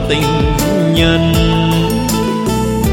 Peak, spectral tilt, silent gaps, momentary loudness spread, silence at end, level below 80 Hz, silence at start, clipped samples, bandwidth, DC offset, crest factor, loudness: 0 dBFS; -5.5 dB/octave; none; 4 LU; 0 s; -22 dBFS; 0 s; under 0.1%; 17 kHz; under 0.1%; 12 dB; -13 LUFS